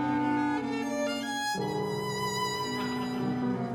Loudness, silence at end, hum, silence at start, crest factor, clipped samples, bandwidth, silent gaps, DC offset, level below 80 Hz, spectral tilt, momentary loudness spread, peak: -31 LUFS; 0 s; none; 0 s; 12 dB; under 0.1%; 17.5 kHz; none; under 0.1%; -64 dBFS; -4.5 dB/octave; 4 LU; -18 dBFS